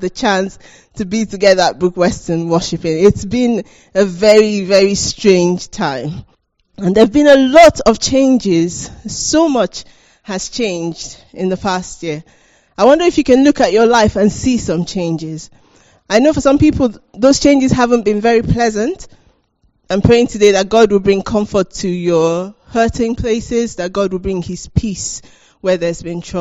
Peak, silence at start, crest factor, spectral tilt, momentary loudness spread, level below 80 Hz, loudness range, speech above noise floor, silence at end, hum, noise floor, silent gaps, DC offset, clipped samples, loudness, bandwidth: 0 dBFS; 0 s; 14 dB; -5 dB/octave; 13 LU; -36 dBFS; 7 LU; 45 dB; 0 s; none; -58 dBFS; none; under 0.1%; 0.3%; -13 LUFS; 10 kHz